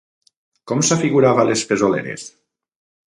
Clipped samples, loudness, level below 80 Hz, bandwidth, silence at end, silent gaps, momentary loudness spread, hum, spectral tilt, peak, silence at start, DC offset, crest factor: under 0.1%; -17 LUFS; -60 dBFS; 11.5 kHz; 0.85 s; none; 16 LU; none; -4.5 dB/octave; -2 dBFS; 0.65 s; under 0.1%; 18 dB